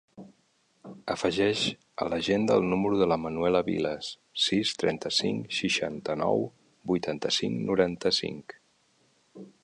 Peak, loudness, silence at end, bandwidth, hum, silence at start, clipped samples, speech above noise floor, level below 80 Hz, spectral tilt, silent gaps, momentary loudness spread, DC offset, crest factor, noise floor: -8 dBFS; -28 LUFS; 0.15 s; 11 kHz; none; 0.15 s; under 0.1%; 41 dB; -60 dBFS; -4.5 dB/octave; none; 10 LU; under 0.1%; 20 dB; -69 dBFS